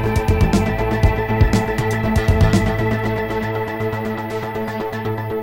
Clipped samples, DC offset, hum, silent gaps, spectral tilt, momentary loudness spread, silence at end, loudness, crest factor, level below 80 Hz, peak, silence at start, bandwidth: under 0.1%; 0.5%; none; none; -7 dB/octave; 8 LU; 0 s; -19 LUFS; 16 dB; -26 dBFS; -2 dBFS; 0 s; 17 kHz